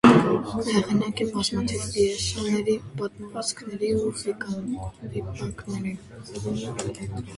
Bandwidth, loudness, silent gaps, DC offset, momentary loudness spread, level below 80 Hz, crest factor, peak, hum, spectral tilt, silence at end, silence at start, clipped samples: 11.5 kHz; -27 LUFS; none; under 0.1%; 11 LU; -48 dBFS; 24 dB; -2 dBFS; none; -5 dB/octave; 0 s; 0.05 s; under 0.1%